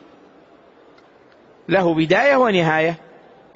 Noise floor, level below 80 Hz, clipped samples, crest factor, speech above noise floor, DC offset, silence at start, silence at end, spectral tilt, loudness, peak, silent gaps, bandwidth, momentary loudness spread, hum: -50 dBFS; -60 dBFS; under 0.1%; 16 dB; 34 dB; under 0.1%; 1.7 s; 0.6 s; -4 dB/octave; -17 LUFS; -4 dBFS; none; 7.8 kHz; 13 LU; none